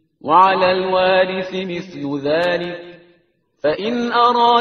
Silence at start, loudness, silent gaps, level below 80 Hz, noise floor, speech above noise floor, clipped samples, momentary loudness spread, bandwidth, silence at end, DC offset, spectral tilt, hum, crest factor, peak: 0.25 s; -17 LUFS; none; -56 dBFS; -60 dBFS; 43 dB; under 0.1%; 13 LU; 6.6 kHz; 0 s; under 0.1%; -2.5 dB/octave; none; 16 dB; 0 dBFS